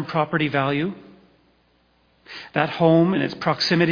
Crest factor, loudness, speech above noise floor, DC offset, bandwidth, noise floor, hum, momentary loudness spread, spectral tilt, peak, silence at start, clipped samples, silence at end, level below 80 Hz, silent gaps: 18 dB; -21 LUFS; 41 dB; under 0.1%; 5.4 kHz; -62 dBFS; none; 17 LU; -6.5 dB/octave; -4 dBFS; 0 s; under 0.1%; 0 s; -60 dBFS; none